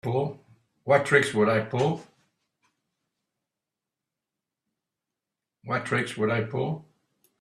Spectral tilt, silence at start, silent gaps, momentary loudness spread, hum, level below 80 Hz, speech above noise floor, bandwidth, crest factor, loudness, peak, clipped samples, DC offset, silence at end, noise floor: -6 dB/octave; 0.05 s; none; 13 LU; none; -68 dBFS; 63 dB; 12.5 kHz; 24 dB; -26 LUFS; -6 dBFS; under 0.1%; under 0.1%; 0.6 s; -88 dBFS